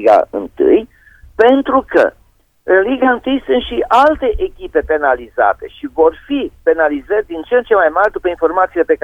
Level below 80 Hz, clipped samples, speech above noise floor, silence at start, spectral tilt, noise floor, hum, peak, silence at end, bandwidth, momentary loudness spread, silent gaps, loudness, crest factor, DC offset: -38 dBFS; under 0.1%; 33 dB; 0 s; -6 dB/octave; -46 dBFS; none; 0 dBFS; 0.1 s; 7.8 kHz; 8 LU; none; -14 LUFS; 14 dB; under 0.1%